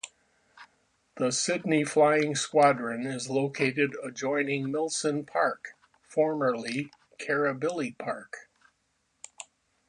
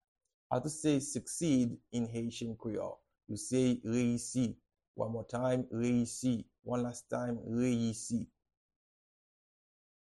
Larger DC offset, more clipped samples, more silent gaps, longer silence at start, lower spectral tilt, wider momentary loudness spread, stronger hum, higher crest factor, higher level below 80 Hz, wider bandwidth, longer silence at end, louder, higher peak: neither; neither; second, none vs 4.88-4.94 s; second, 0.05 s vs 0.5 s; second, -4 dB/octave vs -5.5 dB/octave; first, 19 LU vs 9 LU; neither; about the same, 20 dB vs 18 dB; second, -76 dBFS vs -66 dBFS; about the same, 11 kHz vs 12 kHz; second, 0.45 s vs 1.85 s; first, -28 LUFS vs -35 LUFS; first, -8 dBFS vs -18 dBFS